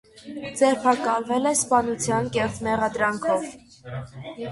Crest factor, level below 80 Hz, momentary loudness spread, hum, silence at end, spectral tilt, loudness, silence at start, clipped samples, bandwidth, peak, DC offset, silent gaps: 18 dB; -54 dBFS; 17 LU; none; 0 s; -4 dB/octave; -23 LUFS; 0.15 s; under 0.1%; 12 kHz; -6 dBFS; under 0.1%; none